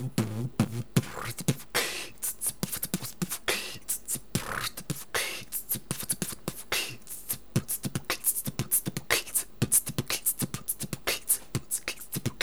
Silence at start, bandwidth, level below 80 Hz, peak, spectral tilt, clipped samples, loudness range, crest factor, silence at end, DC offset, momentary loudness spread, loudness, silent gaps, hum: 0 s; over 20 kHz; -56 dBFS; -8 dBFS; -3 dB/octave; under 0.1%; 4 LU; 24 dB; 0 s; 0.6%; 7 LU; -30 LUFS; none; none